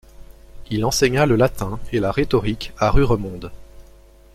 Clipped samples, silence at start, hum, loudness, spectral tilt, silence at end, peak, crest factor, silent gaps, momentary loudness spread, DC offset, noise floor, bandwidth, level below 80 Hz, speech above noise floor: under 0.1%; 0.2 s; none; -20 LUFS; -5.5 dB/octave; 0.55 s; -2 dBFS; 18 dB; none; 12 LU; under 0.1%; -47 dBFS; 15.5 kHz; -30 dBFS; 28 dB